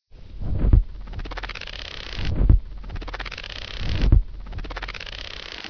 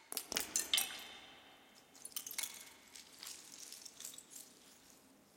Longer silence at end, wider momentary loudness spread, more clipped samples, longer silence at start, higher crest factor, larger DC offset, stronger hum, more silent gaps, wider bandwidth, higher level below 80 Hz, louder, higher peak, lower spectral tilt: about the same, 0 s vs 0 s; second, 15 LU vs 25 LU; neither; first, 0.15 s vs 0 s; second, 20 dB vs 32 dB; neither; neither; neither; second, 5.4 kHz vs 17 kHz; first, -24 dBFS vs -80 dBFS; first, -27 LUFS vs -41 LUFS; first, -4 dBFS vs -14 dBFS; first, -6.5 dB/octave vs 1.5 dB/octave